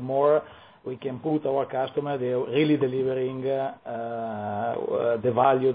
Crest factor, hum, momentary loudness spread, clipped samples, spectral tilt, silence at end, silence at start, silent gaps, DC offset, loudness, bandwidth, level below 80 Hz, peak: 18 dB; none; 10 LU; under 0.1%; -11 dB/octave; 0 s; 0 s; none; under 0.1%; -26 LUFS; 4.9 kHz; -68 dBFS; -8 dBFS